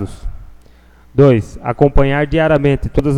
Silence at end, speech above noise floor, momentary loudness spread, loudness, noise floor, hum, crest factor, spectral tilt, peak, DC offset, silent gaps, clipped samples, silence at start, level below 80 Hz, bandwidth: 0 s; 32 dB; 15 LU; -14 LUFS; -44 dBFS; none; 14 dB; -8.5 dB/octave; 0 dBFS; under 0.1%; none; under 0.1%; 0 s; -24 dBFS; 10 kHz